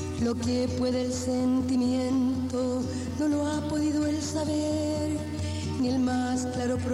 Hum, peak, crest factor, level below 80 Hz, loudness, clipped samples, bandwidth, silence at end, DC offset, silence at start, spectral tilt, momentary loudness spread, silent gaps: none; -16 dBFS; 10 dB; -50 dBFS; -28 LUFS; under 0.1%; 12.5 kHz; 0 s; under 0.1%; 0 s; -6 dB/octave; 4 LU; none